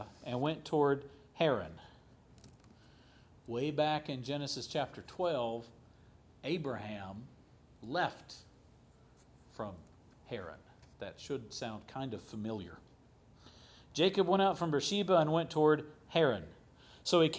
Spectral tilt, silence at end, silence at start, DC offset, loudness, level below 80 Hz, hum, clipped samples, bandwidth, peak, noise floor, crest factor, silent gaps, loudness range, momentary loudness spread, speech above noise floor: -5.5 dB/octave; 0 s; 0 s; under 0.1%; -35 LUFS; -66 dBFS; none; under 0.1%; 8 kHz; -14 dBFS; -63 dBFS; 22 dB; none; 13 LU; 20 LU; 29 dB